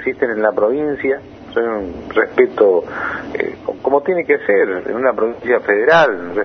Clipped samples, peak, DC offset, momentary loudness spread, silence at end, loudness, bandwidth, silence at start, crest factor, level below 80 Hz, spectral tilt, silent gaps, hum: under 0.1%; 0 dBFS; under 0.1%; 10 LU; 0 s; -16 LUFS; 6.4 kHz; 0 s; 16 dB; -50 dBFS; -6.5 dB/octave; none; none